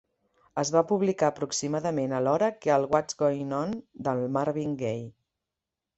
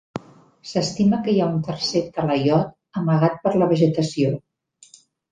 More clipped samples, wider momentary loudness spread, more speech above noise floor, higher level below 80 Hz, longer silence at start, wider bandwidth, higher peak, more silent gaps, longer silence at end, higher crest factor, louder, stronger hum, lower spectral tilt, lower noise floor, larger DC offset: neither; about the same, 8 LU vs 10 LU; first, 61 dB vs 32 dB; second, -66 dBFS vs -56 dBFS; first, 0.55 s vs 0.15 s; second, 8.4 kHz vs 9.4 kHz; second, -8 dBFS vs -4 dBFS; neither; about the same, 0.85 s vs 0.95 s; about the same, 20 dB vs 16 dB; second, -28 LUFS vs -21 LUFS; neither; about the same, -5.5 dB/octave vs -6.5 dB/octave; first, -88 dBFS vs -52 dBFS; neither